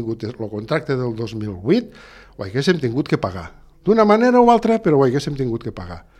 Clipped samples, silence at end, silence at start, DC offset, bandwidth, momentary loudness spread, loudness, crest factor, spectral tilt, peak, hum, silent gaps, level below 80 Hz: under 0.1%; 0.2 s; 0 s; under 0.1%; 11.5 kHz; 15 LU; -18 LUFS; 18 dB; -7 dB/octave; -2 dBFS; none; none; -46 dBFS